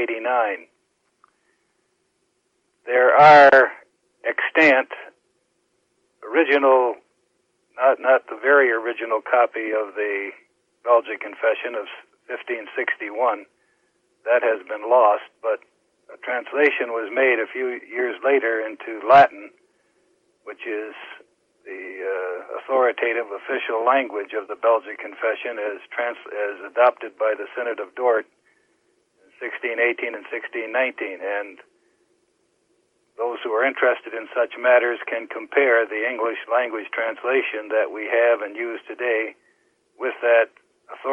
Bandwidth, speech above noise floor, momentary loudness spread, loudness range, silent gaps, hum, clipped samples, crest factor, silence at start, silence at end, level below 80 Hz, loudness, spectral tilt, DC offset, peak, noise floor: 7.4 kHz; 49 dB; 15 LU; 10 LU; none; none; under 0.1%; 18 dB; 0 s; 0 s; -70 dBFS; -20 LUFS; -5.5 dB/octave; under 0.1%; -4 dBFS; -70 dBFS